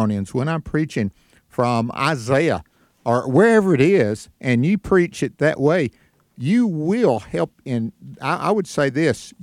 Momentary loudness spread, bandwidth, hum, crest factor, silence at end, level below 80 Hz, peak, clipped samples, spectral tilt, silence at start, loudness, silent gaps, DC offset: 10 LU; 14 kHz; none; 18 dB; 0.1 s; -50 dBFS; -2 dBFS; under 0.1%; -7 dB/octave; 0 s; -20 LUFS; none; under 0.1%